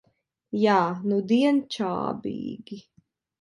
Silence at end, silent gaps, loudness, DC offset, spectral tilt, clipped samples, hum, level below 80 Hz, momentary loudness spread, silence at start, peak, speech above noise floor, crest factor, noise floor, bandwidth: 0.6 s; none; -25 LUFS; under 0.1%; -6.5 dB/octave; under 0.1%; none; -68 dBFS; 17 LU; 0.5 s; -8 dBFS; 40 dB; 18 dB; -64 dBFS; 11 kHz